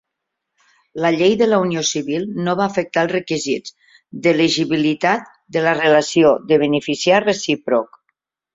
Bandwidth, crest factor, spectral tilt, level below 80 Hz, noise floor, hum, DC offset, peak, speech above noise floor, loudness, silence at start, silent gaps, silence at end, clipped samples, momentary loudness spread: 7.8 kHz; 18 dB; -4.5 dB/octave; -60 dBFS; -79 dBFS; none; under 0.1%; 0 dBFS; 62 dB; -17 LUFS; 0.95 s; none; 0.7 s; under 0.1%; 9 LU